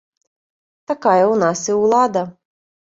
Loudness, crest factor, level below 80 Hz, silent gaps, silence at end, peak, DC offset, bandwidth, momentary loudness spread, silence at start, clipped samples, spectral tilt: -16 LUFS; 18 dB; -62 dBFS; none; 0.65 s; -2 dBFS; under 0.1%; 7.8 kHz; 11 LU; 0.9 s; under 0.1%; -5 dB/octave